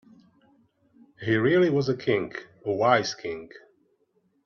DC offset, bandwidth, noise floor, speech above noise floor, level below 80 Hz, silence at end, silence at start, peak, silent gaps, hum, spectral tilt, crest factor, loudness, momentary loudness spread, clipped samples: under 0.1%; 7.2 kHz; -69 dBFS; 45 dB; -66 dBFS; 0.85 s; 1.2 s; -6 dBFS; none; none; -6 dB/octave; 20 dB; -25 LUFS; 15 LU; under 0.1%